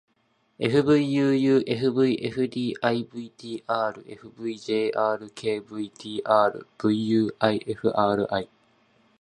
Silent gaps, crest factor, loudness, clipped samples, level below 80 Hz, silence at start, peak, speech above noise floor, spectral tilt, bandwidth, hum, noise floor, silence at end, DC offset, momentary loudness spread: none; 20 dB; -25 LUFS; under 0.1%; -64 dBFS; 0.6 s; -4 dBFS; 44 dB; -7 dB/octave; 11 kHz; none; -68 dBFS; 0.75 s; under 0.1%; 14 LU